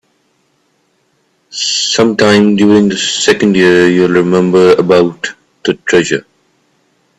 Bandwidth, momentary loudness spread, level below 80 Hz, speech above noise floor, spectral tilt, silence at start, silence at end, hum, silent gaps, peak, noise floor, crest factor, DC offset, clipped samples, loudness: 11 kHz; 10 LU; -50 dBFS; 49 dB; -4.5 dB/octave; 1.5 s; 1 s; none; none; 0 dBFS; -58 dBFS; 12 dB; under 0.1%; under 0.1%; -10 LUFS